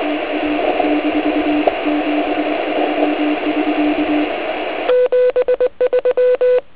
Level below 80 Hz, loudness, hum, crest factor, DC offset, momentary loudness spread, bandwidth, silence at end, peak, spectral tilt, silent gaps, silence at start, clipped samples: -48 dBFS; -16 LUFS; none; 16 dB; 1%; 5 LU; 4 kHz; 0.15 s; 0 dBFS; -8 dB/octave; none; 0 s; under 0.1%